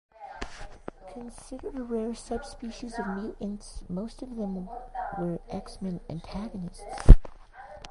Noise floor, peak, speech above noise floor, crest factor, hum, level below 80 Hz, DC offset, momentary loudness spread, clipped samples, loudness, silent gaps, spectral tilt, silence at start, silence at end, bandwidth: -47 dBFS; 0 dBFS; 22 dB; 26 dB; none; -28 dBFS; under 0.1%; 15 LU; under 0.1%; -31 LUFS; none; -7.5 dB/octave; 0.2 s; 0 s; 11 kHz